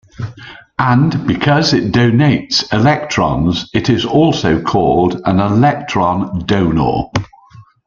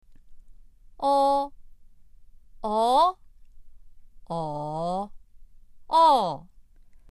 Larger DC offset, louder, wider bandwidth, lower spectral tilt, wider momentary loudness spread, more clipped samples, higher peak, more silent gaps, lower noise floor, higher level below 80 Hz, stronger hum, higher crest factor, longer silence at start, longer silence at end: neither; first, -13 LUFS vs -24 LUFS; second, 7.4 kHz vs 12.5 kHz; about the same, -6 dB/octave vs -5.5 dB/octave; second, 7 LU vs 16 LU; neither; first, 0 dBFS vs -10 dBFS; neither; second, -41 dBFS vs -51 dBFS; first, -38 dBFS vs -52 dBFS; neither; second, 12 dB vs 18 dB; about the same, 0.2 s vs 0.1 s; second, 0.25 s vs 0.5 s